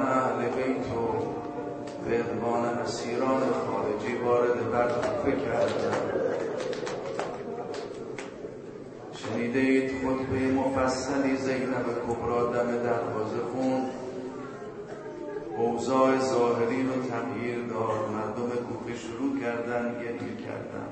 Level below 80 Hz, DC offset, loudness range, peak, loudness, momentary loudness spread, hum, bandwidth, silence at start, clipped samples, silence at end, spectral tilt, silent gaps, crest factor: -58 dBFS; under 0.1%; 4 LU; -10 dBFS; -29 LUFS; 12 LU; none; 8.8 kHz; 0 s; under 0.1%; 0 s; -6 dB/octave; none; 18 dB